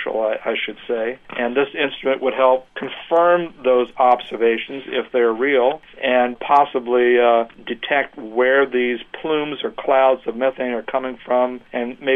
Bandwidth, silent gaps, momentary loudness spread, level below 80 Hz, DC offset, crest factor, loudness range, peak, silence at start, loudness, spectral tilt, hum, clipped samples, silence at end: 3.9 kHz; none; 9 LU; -58 dBFS; under 0.1%; 16 dB; 2 LU; -2 dBFS; 0 s; -19 LUFS; -6.5 dB/octave; none; under 0.1%; 0 s